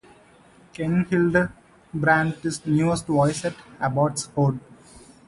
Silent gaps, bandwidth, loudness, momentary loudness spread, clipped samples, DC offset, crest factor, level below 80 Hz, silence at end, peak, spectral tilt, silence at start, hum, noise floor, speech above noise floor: none; 11.5 kHz; -23 LUFS; 10 LU; under 0.1%; under 0.1%; 20 dB; -52 dBFS; 0.3 s; -4 dBFS; -6 dB/octave; 0.8 s; none; -53 dBFS; 31 dB